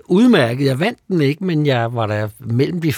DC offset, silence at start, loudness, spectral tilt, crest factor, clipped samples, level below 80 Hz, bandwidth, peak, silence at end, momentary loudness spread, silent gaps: under 0.1%; 0.1 s; -17 LUFS; -7 dB/octave; 14 dB; under 0.1%; -60 dBFS; 17.5 kHz; -2 dBFS; 0 s; 8 LU; none